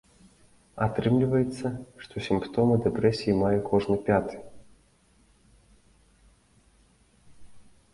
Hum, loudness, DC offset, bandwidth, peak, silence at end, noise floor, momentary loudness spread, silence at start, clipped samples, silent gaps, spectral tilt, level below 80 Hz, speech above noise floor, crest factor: none; -26 LUFS; under 0.1%; 11.5 kHz; -8 dBFS; 0.3 s; -62 dBFS; 15 LU; 0.75 s; under 0.1%; none; -8 dB/octave; -52 dBFS; 37 dB; 20 dB